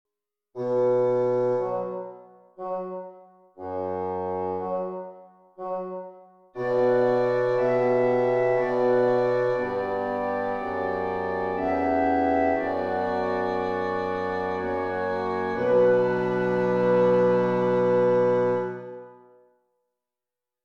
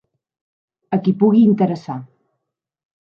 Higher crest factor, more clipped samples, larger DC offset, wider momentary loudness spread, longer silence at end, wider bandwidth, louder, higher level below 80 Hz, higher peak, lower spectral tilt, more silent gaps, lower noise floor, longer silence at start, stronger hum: about the same, 14 dB vs 16 dB; neither; neither; second, 14 LU vs 17 LU; first, 1.5 s vs 1.05 s; first, 6.4 kHz vs 5.8 kHz; second, -25 LUFS vs -16 LUFS; first, -60 dBFS vs -66 dBFS; second, -12 dBFS vs -4 dBFS; second, -8.5 dB/octave vs -10 dB/octave; neither; first, -90 dBFS vs -78 dBFS; second, 0.55 s vs 0.9 s; neither